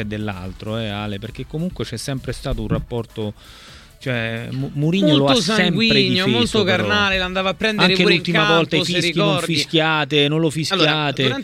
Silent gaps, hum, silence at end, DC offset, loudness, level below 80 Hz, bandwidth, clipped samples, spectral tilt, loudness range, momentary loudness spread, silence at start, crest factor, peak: none; none; 0 s; under 0.1%; -18 LUFS; -40 dBFS; 15.5 kHz; under 0.1%; -5 dB/octave; 10 LU; 12 LU; 0 s; 18 dB; 0 dBFS